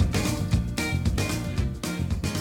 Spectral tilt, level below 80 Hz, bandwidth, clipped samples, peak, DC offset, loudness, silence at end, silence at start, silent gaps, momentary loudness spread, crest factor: -5 dB/octave; -32 dBFS; 17.5 kHz; under 0.1%; -12 dBFS; under 0.1%; -27 LUFS; 0 s; 0 s; none; 4 LU; 14 dB